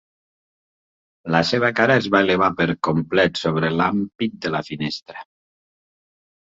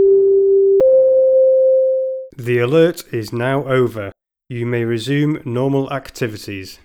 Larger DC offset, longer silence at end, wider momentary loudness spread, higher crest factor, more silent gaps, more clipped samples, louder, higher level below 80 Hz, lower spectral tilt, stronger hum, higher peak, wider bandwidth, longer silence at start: neither; first, 1.25 s vs 0.1 s; second, 11 LU vs 14 LU; first, 20 dB vs 14 dB; neither; neither; second, -20 LUFS vs -15 LUFS; about the same, -54 dBFS vs -52 dBFS; about the same, -6 dB/octave vs -7 dB/octave; neither; about the same, -2 dBFS vs -2 dBFS; second, 7.8 kHz vs 15.5 kHz; first, 1.25 s vs 0 s